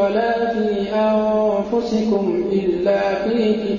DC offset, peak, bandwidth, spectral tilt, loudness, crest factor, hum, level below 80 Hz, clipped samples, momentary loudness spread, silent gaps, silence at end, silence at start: under 0.1%; -6 dBFS; 7.4 kHz; -7 dB/octave; -19 LUFS; 12 dB; none; -48 dBFS; under 0.1%; 3 LU; none; 0 s; 0 s